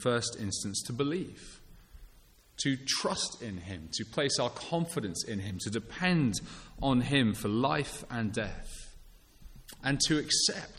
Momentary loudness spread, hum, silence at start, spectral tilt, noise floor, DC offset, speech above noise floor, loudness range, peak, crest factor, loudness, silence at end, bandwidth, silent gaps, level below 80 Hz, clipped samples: 15 LU; none; 0 s; -4 dB/octave; -59 dBFS; under 0.1%; 27 dB; 4 LU; -14 dBFS; 18 dB; -31 LUFS; 0 s; 16 kHz; none; -52 dBFS; under 0.1%